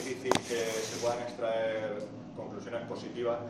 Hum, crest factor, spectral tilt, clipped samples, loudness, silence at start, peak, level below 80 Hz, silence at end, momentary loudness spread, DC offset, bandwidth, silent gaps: none; 28 dB; -4 dB/octave; under 0.1%; -34 LUFS; 0 s; -6 dBFS; -68 dBFS; 0 s; 11 LU; under 0.1%; 14 kHz; none